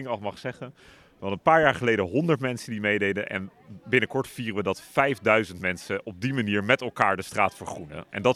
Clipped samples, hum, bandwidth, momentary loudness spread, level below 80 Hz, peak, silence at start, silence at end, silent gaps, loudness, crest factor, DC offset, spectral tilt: under 0.1%; none; 15.5 kHz; 15 LU; -62 dBFS; -4 dBFS; 0 s; 0 s; none; -25 LUFS; 22 dB; under 0.1%; -5.5 dB/octave